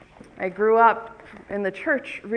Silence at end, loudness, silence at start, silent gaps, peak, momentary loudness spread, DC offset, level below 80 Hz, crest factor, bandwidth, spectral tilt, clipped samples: 0 s; -22 LUFS; 0.35 s; none; -4 dBFS; 15 LU; under 0.1%; -60 dBFS; 20 dB; 9.4 kHz; -6.5 dB/octave; under 0.1%